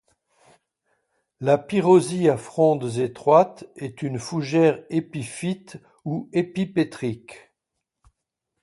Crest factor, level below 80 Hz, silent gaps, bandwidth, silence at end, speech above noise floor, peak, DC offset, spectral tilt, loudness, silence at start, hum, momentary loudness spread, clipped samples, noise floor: 20 dB; -64 dBFS; none; 11.5 kHz; 1.25 s; 60 dB; -4 dBFS; under 0.1%; -6.5 dB/octave; -22 LUFS; 1.4 s; none; 14 LU; under 0.1%; -82 dBFS